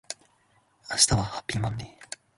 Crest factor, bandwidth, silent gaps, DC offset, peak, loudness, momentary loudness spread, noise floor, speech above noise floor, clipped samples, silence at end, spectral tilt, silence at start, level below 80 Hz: 26 dB; 12 kHz; none; under 0.1%; -4 dBFS; -25 LUFS; 19 LU; -66 dBFS; 39 dB; under 0.1%; 0.3 s; -2.5 dB/octave; 0.1 s; -48 dBFS